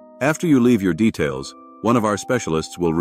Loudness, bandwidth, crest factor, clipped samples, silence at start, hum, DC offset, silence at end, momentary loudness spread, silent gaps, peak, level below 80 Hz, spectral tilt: -19 LUFS; 15.5 kHz; 14 dB; under 0.1%; 0.2 s; none; under 0.1%; 0 s; 9 LU; none; -4 dBFS; -50 dBFS; -6 dB/octave